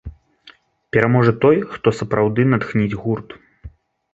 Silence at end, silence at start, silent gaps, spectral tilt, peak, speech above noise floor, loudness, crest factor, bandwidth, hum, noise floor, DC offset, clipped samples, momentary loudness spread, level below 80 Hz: 0.45 s; 0.05 s; none; -8.5 dB/octave; 0 dBFS; 33 dB; -18 LUFS; 18 dB; 8 kHz; none; -50 dBFS; under 0.1%; under 0.1%; 10 LU; -46 dBFS